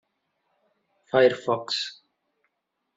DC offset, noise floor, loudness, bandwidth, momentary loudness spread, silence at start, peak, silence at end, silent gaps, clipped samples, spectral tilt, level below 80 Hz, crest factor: under 0.1%; -79 dBFS; -24 LUFS; 7.8 kHz; 8 LU; 1.15 s; -6 dBFS; 1.05 s; none; under 0.1%; -4 dB/octave; -72 dBFS; 22 dB